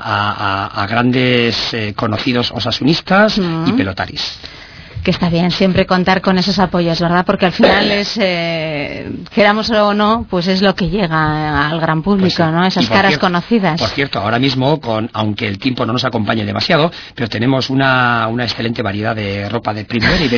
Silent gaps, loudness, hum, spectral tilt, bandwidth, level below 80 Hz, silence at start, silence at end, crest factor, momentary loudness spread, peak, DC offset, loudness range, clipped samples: none; -14 LUFS; none; -6 dB/octave; 5.4 kHz; -38 dBFS; 0 s; 0 s; 14 dB; 8 LU; 0 dBFS; under 0.1%; 2 LU; under 0.1%